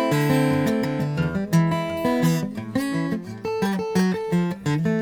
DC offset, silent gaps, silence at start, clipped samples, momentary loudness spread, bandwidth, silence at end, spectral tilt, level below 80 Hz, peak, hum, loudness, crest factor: under 0.1%; none; 0 s; under 0.1%; 6 LU; over 20 kHz; 0 s; -6.5 dB/octave; -52 dBFS; -6 dBFS; none; -23 LUFS; 16 dB